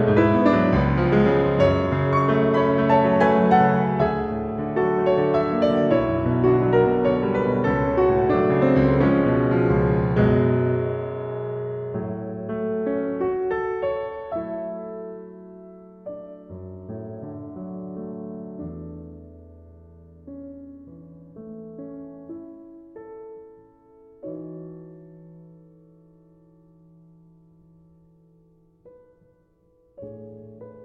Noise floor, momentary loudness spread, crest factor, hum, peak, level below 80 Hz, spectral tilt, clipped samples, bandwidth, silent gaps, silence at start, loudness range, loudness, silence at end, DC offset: -61 dBFS; 23 LU; 20 dB; none; -4 dBFS; -42 dBFS; -9.5 dB/octave; under 0.1%; 7 kHz; none; 0 s; 23 LU; -21 LUFS; 0 s; under 0.1%